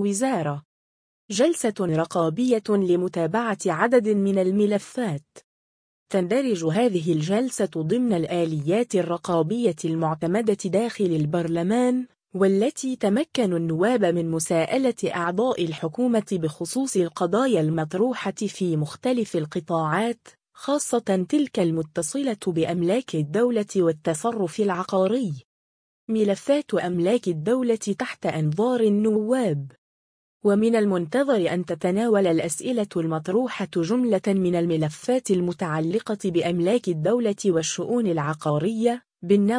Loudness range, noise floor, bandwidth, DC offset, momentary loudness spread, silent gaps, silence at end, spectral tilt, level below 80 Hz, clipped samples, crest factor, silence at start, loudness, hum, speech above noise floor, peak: 2 LU; under -90 dBFS; 10.5 kHz; under 0.1%; 6 LU; 0.65-1.28 s, 5.44-6.06 s, 25.45-26.07 s, 29.78-30.40 s; 0 s; -6 dB/octave; -66 dBFS; under 0.1%; 18 dB; 0 s; -23 LUFS; none; over 67 dB; -6 dBFS